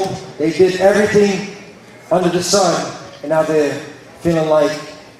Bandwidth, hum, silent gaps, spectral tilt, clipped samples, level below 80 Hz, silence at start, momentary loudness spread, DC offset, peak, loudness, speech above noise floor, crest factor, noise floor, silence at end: 15.5 kHz; none; none; -4.5 dB/octave; under 0.1%; -52 dBFS; 0 s; 15 LU; under 0.1%; 0 dBFS; -15 LUFS; 24 dB; 16 dB; -39 dBFS; 0.2 s